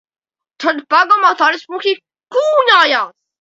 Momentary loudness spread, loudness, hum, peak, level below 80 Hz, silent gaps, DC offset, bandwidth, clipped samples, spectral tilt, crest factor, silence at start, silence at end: 10 LU; -13 LUFS; none; 0 dBFS; -70 dBFS; none; under 0.1%; 8 kHz; under 0.1%; -1 dB/octave; 14 dB; 0.6 s; 0.3 s